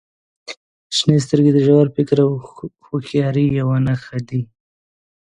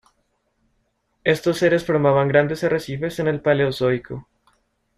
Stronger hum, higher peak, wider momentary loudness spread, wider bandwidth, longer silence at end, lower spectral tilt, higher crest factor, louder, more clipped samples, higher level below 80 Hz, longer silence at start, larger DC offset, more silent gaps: neither; about the same, 0 dBFS vs -2 dBFS; first, 21 LU vs 9 LU; second, 10.5 kHz vs 14 kHz; about the same, 0.85 s vs 0.75 s; about the same, -7 dB/octave vs -6.5 dB/octave; about the same, 18 dB vs 20 dB; first, -17 LUFS vs -20 LUFS; neither; about the same, -50 dBFS vs -54 dBFS; second, 0.5 s vs 1.25 s; neither; first, 0.57-0.90 s vs none